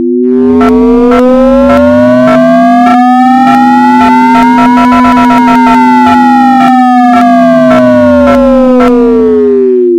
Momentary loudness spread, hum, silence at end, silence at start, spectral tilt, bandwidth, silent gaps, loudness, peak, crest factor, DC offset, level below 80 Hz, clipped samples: 1 LU; none; 0 s; 0 s; -6.5 dB/octave; 9.4 kHz; none; -4 LUFS; 0 dBFS; 4 dB; under 0.1%; -30 dBFS; 7%